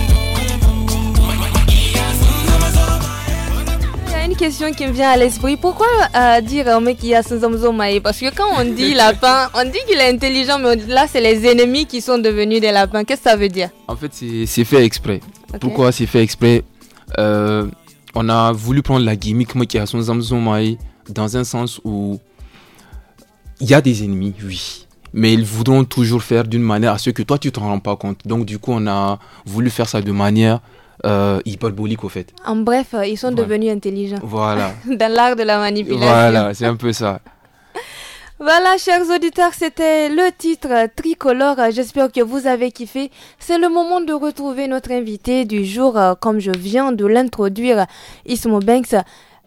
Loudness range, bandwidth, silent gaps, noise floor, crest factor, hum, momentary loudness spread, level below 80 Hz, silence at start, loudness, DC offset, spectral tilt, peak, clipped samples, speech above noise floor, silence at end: 5 LU; 17 kHz; none; -43 dBFS; 16 dB; none; 11 LU; -26 dBFS; 0 s; -16 LUFS; under 0.1%; -5.5 dB/octave; 0 dBFS; under 0.1%; 28 dB; 0.45 s